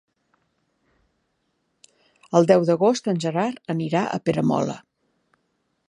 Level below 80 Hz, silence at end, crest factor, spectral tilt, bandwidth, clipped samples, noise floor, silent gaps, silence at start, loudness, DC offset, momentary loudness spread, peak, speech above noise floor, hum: -68 dBFS; 1.1 s; 22 dB; -6.5 dB/octave; 10.5 kHz; under 0.1%; -72 dBFS; none; 2.3 s; -22 LUFS; under 0.1%; 9 LU; -2 dBFS; 52 dB; none